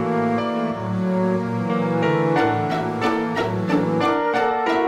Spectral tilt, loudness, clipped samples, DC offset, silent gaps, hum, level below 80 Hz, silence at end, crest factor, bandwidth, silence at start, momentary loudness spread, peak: -7.5 dB/octave; -21 LUFS; under 0.1%; under 0.1%; none; none; -54 dBFS; 0 s; 14 dB; 12.5 kHz; 0 s; 4 LU; -6 dBFS